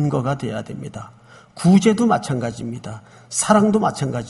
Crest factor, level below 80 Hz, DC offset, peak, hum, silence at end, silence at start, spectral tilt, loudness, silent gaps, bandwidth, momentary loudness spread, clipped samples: 18 dB; -52 dBFS; under 0.1%; 0 dBFS; none; 0 s; 0 s; -6 dB/octave; -18 LUFS; none; 11.5 kHz; 19 LU; under 0.1%